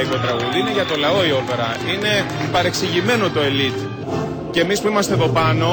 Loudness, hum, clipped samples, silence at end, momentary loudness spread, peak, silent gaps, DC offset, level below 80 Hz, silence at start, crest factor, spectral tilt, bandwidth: -18 LUFS; none; under 0.1%; 0 s; 5 LU; -6 dBFS; none; under 0.1%; -48 dBFS; 0 s; 12 dB; -4.5 dB/octave; over 20 kHz